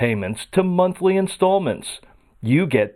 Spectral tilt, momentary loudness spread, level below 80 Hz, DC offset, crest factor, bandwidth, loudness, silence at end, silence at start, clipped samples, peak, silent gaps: -6.5 dB/octave; 12 LU; -54 dBFS; under 0.1%; 16 dB; 14 kHz; -20 LUFS; 0.05 s; 0 s; under 0.1%; -4 dBFS; none